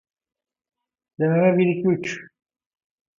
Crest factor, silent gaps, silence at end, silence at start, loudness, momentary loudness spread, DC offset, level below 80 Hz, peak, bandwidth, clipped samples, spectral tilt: 20 dB; none; 0.95 s; 1.2 s; -21 LUFS; 12 LU; under 0.1%; -68 dBFS; -6 dBFS; 7.4 kHz; under 0.1%; -7.5 dB/octave